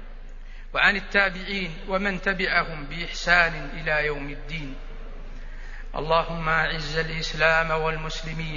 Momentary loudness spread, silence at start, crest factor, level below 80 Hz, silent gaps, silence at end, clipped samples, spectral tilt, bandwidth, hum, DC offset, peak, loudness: 22 LU; 0 s; 22 dB; -34 dBFS; none; 0 s; under 0.1%; -4.5 dB/octave; 7.4 kHz; none; under 0.1%; -4 dBFS; -24 LUFS